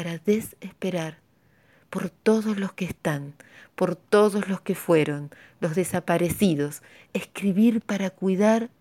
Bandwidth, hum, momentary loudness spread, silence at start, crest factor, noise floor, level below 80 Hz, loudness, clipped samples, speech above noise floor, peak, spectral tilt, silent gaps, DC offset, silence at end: 16.5 kHz; none; 13 LU; 0 s; 18 dB; -61 dBFS; -60 dBFS; -25 LUFS; under 0.1%; 37 dB; -6 dBFS; -6 dB/octave; none; under 0.1%; 0.15 s